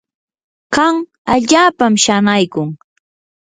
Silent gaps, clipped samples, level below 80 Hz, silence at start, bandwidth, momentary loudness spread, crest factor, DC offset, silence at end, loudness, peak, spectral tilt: 1.18-1.25 s; under 0.1%; -50 dBFS; 0.7 s; 9.6 kHz; 10 LU; 14 dB; under 0.1%; 0.7 s; -13 LUFS; 0 dBFS; -3.5 dB/octave